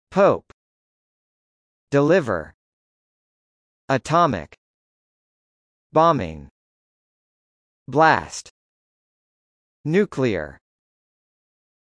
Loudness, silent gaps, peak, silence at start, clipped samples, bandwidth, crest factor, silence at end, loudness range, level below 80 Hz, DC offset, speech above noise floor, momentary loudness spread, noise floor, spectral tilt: -20 LUFS; 0.53-1.87 s, 2.54-3.88 s, 4.58-5.90 s, 6.51-7.86 s, 8.50-9.84 s; -2 dBFS; 0.1 s; under 0.1%; 10.5 kHz; 22 dB; 1.4 s; 4 LU; -54 dBFS; under 0.1%; over 71 dB; 16 LU; under -90 dBFS; -6 dB/octave